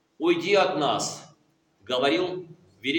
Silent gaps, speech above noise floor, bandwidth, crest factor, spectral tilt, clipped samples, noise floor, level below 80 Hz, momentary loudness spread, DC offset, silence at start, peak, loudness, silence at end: none; 41 dB; 17 kHz; 18 dB; -3.5 dB/octave; under 0.1%; -65 dBFS; -76 dBFS; 11 LU; under 0.1%; 0.2 s; -8 dBFS; -25 LUFS; 0 s